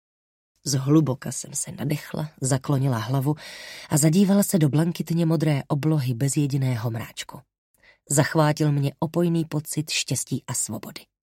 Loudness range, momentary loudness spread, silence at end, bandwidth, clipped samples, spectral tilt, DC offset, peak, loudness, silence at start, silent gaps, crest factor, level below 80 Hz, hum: 3 LU; 13 LU; 0.35 s; 16.5 kHz; under 0.1%; -5.5 dB/octave; under 0.1%; -4 dBFS; -24 LUFS; 0.65 s; 7.58-7.74 s; 20 dB; -62 dBFS; none